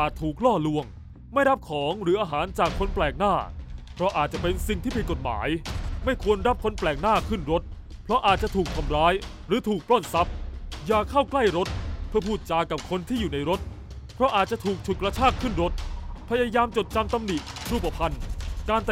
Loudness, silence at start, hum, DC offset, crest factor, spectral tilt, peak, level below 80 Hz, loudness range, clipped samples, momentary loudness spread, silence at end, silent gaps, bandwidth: -26 LUFS; 0 s; none; under 0.1%; 18 dB; -5.5 dB/octave; -6 dBFS; -36 dBFS; 2 LU; under 0.1%; 11 LU; 0 s; none; 16 kHz